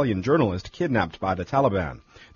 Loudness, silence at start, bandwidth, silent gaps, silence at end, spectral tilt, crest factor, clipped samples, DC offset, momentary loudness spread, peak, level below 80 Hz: -24 LUFS; 0 s; 7.2 kHz; none; 0.1 s; -6 dB/octave; 16 dB; under 0.1%; under 0.1%; 7 LU; -8 dBFS; -48 dBFS